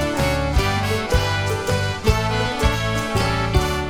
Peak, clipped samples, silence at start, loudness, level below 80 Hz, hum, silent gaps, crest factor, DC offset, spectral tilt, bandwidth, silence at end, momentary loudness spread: -4 dBFS; under 0.1%; 0 s; -20 LUFS; -26 dBFS; none; none; 16 dB; under 0.1%; -5 dB/octave; 19 kHz; 0 s; 2 LU